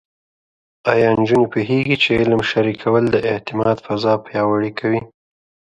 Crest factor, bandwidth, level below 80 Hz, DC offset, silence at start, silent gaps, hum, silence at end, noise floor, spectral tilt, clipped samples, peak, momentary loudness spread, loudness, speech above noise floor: 18 dB; 9.6 kHz; -48 dBFS; under 0.1%; 0.85 s; none; none; 0.7 s; under -90 dBFS; -7 dB/octave; under 0.1%; 0 dBFS; 6 LU; -17 LUFS; over 73 dB